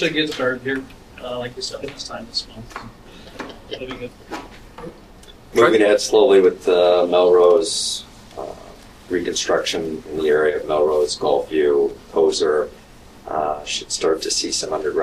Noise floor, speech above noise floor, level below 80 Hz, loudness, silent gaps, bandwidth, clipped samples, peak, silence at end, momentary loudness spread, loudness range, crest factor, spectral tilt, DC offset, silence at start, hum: -43 dBFS; 25 dB; -48 dBFS; -18 LUFS; none; 14 kHz; under 0.1%; 0 dBFS; 0 s; 21 LU; 15 LU; 18 dB; -3 dB/octave; under 0.1%; 0 s; none